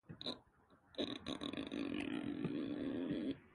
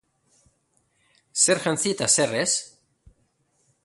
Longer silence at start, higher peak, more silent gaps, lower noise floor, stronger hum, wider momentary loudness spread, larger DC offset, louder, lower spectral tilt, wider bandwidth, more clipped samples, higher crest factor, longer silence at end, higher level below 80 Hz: second, 0.1 s vs 1.35 s; second, -26 dBFS vs -6 dBFS; neither; about the same, -70 dBFS vs -69 dBFS; neither; second, 5 LU vs 9 LU; neither; second, -44 LUFS vs -21 LUFS; first, -6 dB/octave vs -2 dB/octave; about the same, 11.5 kHz vs 12 kHz; neither; about the same, 18 dB vs 22 dB; second, 0 s vs 1.15 s; second, -70 dBFS vs -64 dBFS